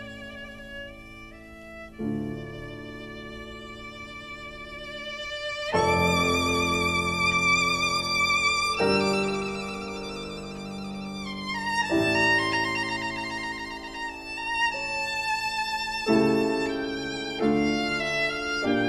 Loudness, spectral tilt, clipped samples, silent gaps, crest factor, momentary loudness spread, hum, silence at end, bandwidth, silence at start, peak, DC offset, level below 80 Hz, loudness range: -26 LUFS; -4 dB/octave; under 0.1%; none; 18 dB; 17 LU; none; 0 s; 13 kHz; 0 s; -10 dBFS; under 0.1%; -50 dBFS; 14 LU